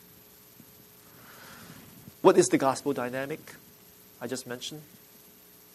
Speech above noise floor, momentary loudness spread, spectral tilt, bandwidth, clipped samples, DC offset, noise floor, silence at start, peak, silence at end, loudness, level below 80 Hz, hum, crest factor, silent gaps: 27 dB; 27 LU; -4.5 dB/octave; 13.5 kHz; under 0.1%; under 0.1%; -55 dBFS; 1.3 s; -4 dBFS; 0.9 s; -27 LUFS; -72 dBFS; none; 26 dB; none